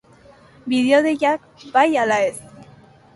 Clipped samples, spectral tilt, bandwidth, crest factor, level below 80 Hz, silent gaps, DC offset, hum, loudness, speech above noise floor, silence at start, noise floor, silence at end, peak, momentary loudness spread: under 0.1%; -4 dB/octave; 11.5 kHz; 18 dB; -62 dBFS; none; under 0.1%; none; -18 LUFS; 31 dB; 0.65 s; -49 dBFS; 0.55 s; -2 dBFS; 11 LU